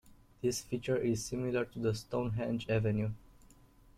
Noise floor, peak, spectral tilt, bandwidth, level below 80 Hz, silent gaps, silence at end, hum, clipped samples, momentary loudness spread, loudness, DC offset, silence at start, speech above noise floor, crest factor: -61 dBFS; -18 dBFS; -6 dB/octave; 15.5 kHz; -58 dBFS; none; 0.7 s; none; under 0.1%; 5 LU; -35 LUFS; under 0.1%; 0.05 s; 27 dB; 16 dB